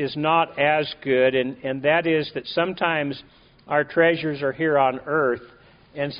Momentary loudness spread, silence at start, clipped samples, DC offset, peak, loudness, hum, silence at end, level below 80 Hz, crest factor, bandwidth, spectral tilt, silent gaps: 8 LU; 0 s; under 0.1%; under 0.1%; -6 dBFS; -22 LUFS; none; 0 s; -60 dBFS; 18 dB; 5.2 kHz; -3 dB/octave; none